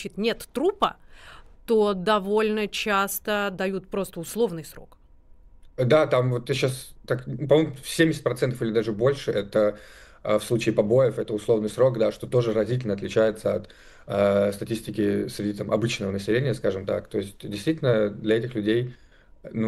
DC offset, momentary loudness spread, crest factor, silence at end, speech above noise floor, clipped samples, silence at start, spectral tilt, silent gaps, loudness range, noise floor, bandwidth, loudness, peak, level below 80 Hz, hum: under 0.1%; 9 LU; 18 dB; 0 s; 27 dB; under 0.1%; 0 s; -6 dB/octave; none; 3 LU; -51 dBFS; 16 kHz; -25 LUFS; -6 dBFS; -52 dBFS; none